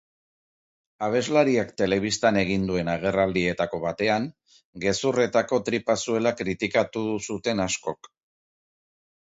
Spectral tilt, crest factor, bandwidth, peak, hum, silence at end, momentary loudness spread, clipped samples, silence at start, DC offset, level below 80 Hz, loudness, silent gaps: -4.5 dB/octave; 20 dB; 8 kHz; -6 dBFS; none; 1.35 s; 7 LU; under 0.1%; 1 s; under 0.1%; -54 dBFS; -25 LUFS; 4.65-4.73 s